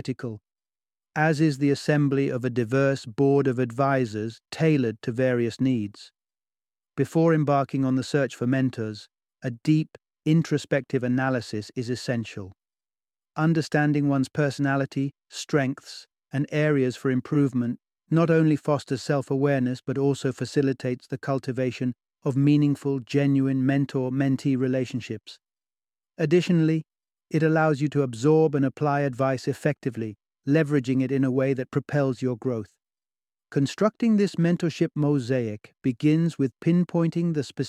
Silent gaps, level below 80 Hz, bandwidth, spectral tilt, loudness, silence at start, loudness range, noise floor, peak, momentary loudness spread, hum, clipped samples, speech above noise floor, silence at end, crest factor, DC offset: none; -66 dBFS; 12 kHz; -7.5 dB/octave; -25 LUFS; 0.05 s; 3 LU; under -90 dBFS; -6 dBFS; 11 LU; none; under 0.1%; over 66 dB; 0 s; 18 dB; under 0.1%